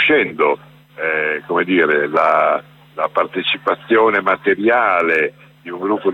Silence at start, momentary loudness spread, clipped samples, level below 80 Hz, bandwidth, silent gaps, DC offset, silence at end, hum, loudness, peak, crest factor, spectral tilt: 0 s; 9 LU; under 0.1%; -62 dBFS; 6.6 kHz; none; under 0.1%; 0 s; none; -16 LUFS; -2 dBFS; 14 dB; -6 dB/octave